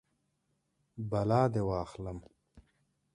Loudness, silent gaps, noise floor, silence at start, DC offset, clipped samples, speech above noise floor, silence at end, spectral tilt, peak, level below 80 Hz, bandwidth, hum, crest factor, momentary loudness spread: -33 LUFS; none; -79 dBFS; 0.95 s; under 0.1%; under 0.1%; 47 dB; 0.55 s; -8.5 dB/octave; -14 dBFS; -56 dBFS; 10.5 kHz; none; 22 dB; 18 LU